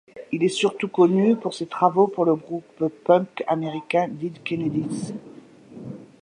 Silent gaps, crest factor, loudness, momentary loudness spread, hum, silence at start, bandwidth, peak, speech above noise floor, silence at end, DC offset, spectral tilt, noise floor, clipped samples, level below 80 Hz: none; 20 dB; -23 LUFS; 15 LU; none; 0.15 s; 11 kHz; -4 dBFS; 22 dB; 0.15 s; under 0.1%; -6 dB/octave; -44 dBFS; under 0.1%; -66 dBFS